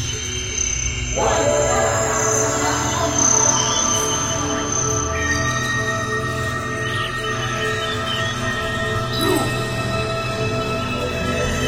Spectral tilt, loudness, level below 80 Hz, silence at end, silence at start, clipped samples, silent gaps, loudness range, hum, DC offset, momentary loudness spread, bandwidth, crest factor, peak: -3 dB/octave; -19 LUFS; -36 dBFS; 0 s; 0 s; under 0.1%; none; 5 LU; none; under 0.1%; 6 LU; 16.5 kHz; 16 dB; -4 dBFS